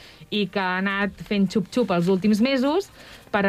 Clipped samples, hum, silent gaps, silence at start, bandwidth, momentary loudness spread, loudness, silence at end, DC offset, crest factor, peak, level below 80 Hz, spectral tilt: under 0.1%; none; none; 0.05 s; 14.5 kHz; 7 LU; -23 LUFS; 0 s; under 0.1%; 14 dB; -10 dBFS; -54 dBFS; -6 dB/octave